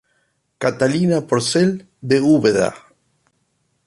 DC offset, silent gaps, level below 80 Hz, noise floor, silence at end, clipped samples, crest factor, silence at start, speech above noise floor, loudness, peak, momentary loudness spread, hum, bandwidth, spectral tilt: under 0.1%; none; -56 dBFS; -67 dBFS; 1.1 s; under 0.1%; 16 dB; 0.6 s; 50 dB; -17 LUFS; -2 dBFS; 9 LU; none; 11.5 kHz; -5.5 dB/octave